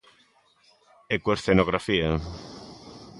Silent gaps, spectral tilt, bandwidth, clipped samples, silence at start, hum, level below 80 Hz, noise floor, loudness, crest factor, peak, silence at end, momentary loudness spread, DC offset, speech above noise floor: none; -6 dB/octave; 11.5 kHz; under 0.1%; 1.1 s; none; -44 dBFS; -62 dBFS; -25 LUFS; 22 dB; -6 dBFS; 0 s; 21 LU; under 0.1%; 38 dB